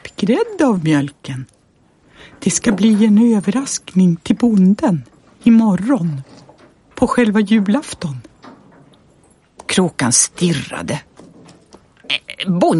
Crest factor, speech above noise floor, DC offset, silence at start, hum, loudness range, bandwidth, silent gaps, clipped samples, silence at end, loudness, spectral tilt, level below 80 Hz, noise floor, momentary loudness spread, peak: 16 dB; 40 dB; under 0.1%; 0.05 s; none; 5 LU; 11.5 kHz; none; under 0.1%; 0 s; -15 LUFS; -5 dB/octave; -50 dBFS; -54 dBFS; 13 LU; 0 dBFS